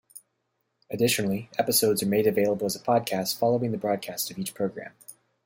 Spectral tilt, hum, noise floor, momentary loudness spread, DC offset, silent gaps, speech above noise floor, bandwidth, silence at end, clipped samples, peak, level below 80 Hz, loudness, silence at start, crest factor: -4 dB/octave; none; -77 dBFS; 9 LU; under 0.1%; none; 51 dB; 16.5 kHz; 0.35 s; under 0.1%; -10 dBFS; -68 dBFS; -26 LUFS; 0.15 s; 18 dB